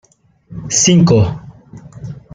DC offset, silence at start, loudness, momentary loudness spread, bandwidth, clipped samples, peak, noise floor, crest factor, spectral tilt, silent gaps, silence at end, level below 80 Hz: under 0.1%; 0.5 s; -12 LUFS; 23 LU; 9.4 kHz; under 0.1%; -2 dBFS; -43 dBFS; 14 dB; -4.5 dB/octave; none; 0.15 s; -42 dBFS